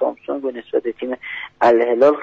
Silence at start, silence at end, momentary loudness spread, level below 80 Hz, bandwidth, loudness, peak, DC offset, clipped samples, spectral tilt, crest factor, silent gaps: 0 s; 0 s; 13 LU; -60 dBFS; 7.6 kHz; -19 LUFS; -4 dBFS; under 0.1%; under 0.1%; -3 dB/octave; 14 dB; none